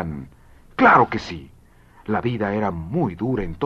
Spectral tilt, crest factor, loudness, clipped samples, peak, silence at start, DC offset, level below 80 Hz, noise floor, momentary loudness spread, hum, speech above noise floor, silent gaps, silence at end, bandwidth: -7.5 dB/octave; 20 dB; -20 LUFS; under 0.1%; -2 dBFS; 0 s; under 0.1%; -42 dBFS; -50 dBFS; 21 LU; none; 30 dB; none; 0 s; 7.8 kHz